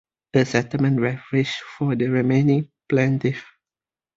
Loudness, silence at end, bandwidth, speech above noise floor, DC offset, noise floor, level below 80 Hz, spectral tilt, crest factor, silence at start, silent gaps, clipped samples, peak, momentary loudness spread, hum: -21 LUFS; 0.75 s; 7.8 kHz; over 70 dB; under 0.1%; under -90 dBFS; -58 dBFS; -7 dB/octave; 18 dB; 0.35 s; none; under 0.1%; -4 dBFS; 7 LU; none